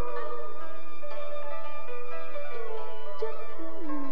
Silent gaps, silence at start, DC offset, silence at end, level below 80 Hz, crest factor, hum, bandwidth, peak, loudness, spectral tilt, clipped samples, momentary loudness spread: none; 0 s; 10%; 0 s; -66 dBFS; 16 dB; 60 Hz at -70 dBFS; over 20 kHz; -14 dBFS; -39 LUFS; -7.5 dB/octave; under 0.1%; 5 LU